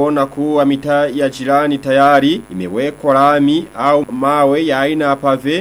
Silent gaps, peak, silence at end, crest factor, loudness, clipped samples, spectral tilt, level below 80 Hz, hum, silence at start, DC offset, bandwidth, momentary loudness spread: none; 0 dBFS; 0 s; 12 dB; -14 LUFS; under 0.1%; -6 dB/octave; -50 dBFS; none; 0 s; under 0.1%; 14.5 kHz; 7 LU